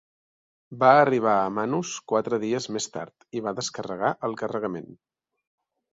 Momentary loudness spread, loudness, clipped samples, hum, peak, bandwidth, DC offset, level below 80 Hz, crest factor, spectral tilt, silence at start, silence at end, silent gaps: 14 LU; -25 LUFS; under 0.1%; none; -4 dBFS; 8 kHz; under 0.1%; -68 dBFS; 22 dB; -4.5 dB/octave; 0.7 s; 1 s; none